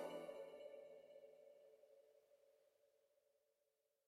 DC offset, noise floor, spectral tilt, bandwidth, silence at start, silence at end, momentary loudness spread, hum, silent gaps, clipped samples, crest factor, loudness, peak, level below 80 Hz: under 0.1%; -88 dBFS; -4.5 dB/octave; 15 kHz; 0 s; 0.95 s; 15 LU; none; none; under 0.1%; 22 dB; -58 LUFS; -38 dBFS; under -90 dBFS